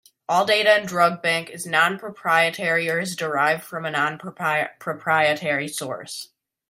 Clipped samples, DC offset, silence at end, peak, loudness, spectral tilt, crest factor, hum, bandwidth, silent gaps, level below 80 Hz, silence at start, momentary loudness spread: under 0.1%; under 0.1%; 0.45 s; -4 dBFS; -21 LUFS; -3.5 dB/octave; 20 dB; none; 16 kHz; none; -70 dBFS; 0.3 s; 11 LU